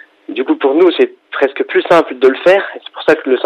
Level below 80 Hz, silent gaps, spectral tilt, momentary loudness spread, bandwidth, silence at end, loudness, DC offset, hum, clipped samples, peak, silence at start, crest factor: -58 dBFS; none; -5.5 dB/octave; 8 LU; 8.8 kHz; 0 s; -12 LUFS; under 0.1%; none; under 0.1%; 0 dBFS; 0.3 s; 12 dB